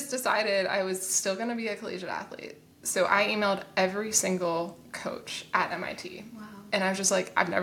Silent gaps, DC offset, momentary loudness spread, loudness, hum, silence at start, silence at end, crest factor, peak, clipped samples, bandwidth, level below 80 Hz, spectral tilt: none; under 0.1%; 14 LU; -28 LUFS; none; 0 s; 0 s; 22 dB; -6 dBFS; under 0.1%; 18 kHz; -70 dBFS; -2.5 dB/octave